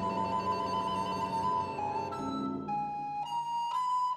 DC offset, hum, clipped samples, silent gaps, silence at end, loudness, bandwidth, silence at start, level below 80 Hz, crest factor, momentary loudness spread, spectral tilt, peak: under 0.1%; none; under 0.1%; none; 0 s; -33 LUFS; 13.5 kHz; 0 s; -64 dBFS; 12 dB; 4 LU; -5.5 dB/octave; -22 dBFS